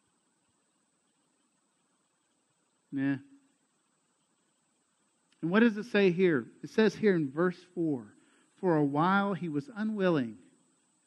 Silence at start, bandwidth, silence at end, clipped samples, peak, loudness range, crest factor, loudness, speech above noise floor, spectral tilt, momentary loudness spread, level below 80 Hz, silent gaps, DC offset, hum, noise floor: 2.9 s; 9.4 kHz; 0.7 s; under 0.1%; -12 dBFS; 13 LU; 20 dB; -30 LUFS; 46 dB; -7.5 dB/octave; 10 LU; -80 dBFS; none; under 0.1%; none; -75 dBFS